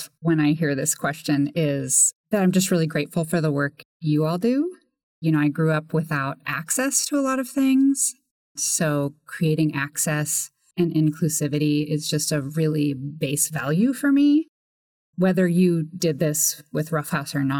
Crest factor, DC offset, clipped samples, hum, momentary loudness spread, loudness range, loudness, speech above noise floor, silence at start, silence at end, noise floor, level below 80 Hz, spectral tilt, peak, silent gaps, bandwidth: 16 dB; under 0.1%; under 0.1%; none; 7 LU; 2 LU; -22 LUFS; over 68 dB; 0 s; 0 s; under -90 dBFS; -68 dBFS; -4.5 dB/octave; -6 dBFS; 2.15-2.24 s, 3.85-4.00 s, 5.03-5.22 s, 8.31-8.55 s, 14.49-15.13 s; 19 kHz